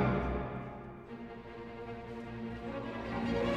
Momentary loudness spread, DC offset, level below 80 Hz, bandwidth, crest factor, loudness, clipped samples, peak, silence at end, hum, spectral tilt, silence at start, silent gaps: 12 LU; under 0.1%; -48 dBFS; 9.4 kHz; 18 dB; -40 LUFS; under 0.1%; -20 dBFS; 0 s; none; -8 dB/octave; 0 s; none